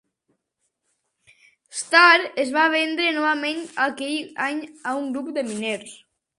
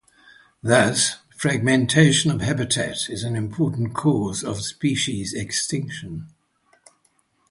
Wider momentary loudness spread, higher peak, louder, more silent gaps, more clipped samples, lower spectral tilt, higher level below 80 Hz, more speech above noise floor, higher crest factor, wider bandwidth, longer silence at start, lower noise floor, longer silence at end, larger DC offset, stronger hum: about the same, 14 LU vs 12 LU; about the same, -2 dBFS vs 0 dBFS; about the same, -21 LUFS vs -21 LUFS; neither; neither; second, -2 dB/octave vs -4 dB/octave; second, -76 dBFS vs -52 dBFS; first, 54 dB vs 44 dB; about the same, 22 dB vs 22 dB; about the same, 11.5 kHz vs 11.5 kHz; first, 1.75 s vs 0.65 s; first, -76 dBFS vs -65 dBFS; second, 0.4 s vs 1.2 s; neither; neither